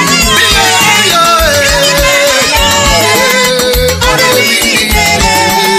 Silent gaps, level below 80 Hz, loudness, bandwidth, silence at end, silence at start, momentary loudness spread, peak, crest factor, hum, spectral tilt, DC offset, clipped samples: none; -22 dBFS; -6 LUFS; over 20 kHz; 0 s; 0 s; 2 LU; 0 dBFS; 8 dB; none; -2 dB/octave; under 0.1%; 0.8%